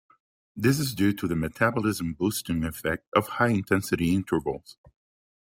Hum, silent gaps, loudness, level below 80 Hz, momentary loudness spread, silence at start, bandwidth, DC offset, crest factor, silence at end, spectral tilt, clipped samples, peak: none; 3.07-3.12 s; -26 LUFS; -52 dBFS; 5 LU; 0.55 s; 16.5 kHz; under 0.1%; 20 dB; 0.9 s; -5.5 dB/octave; under 0.1%; -8 dBFS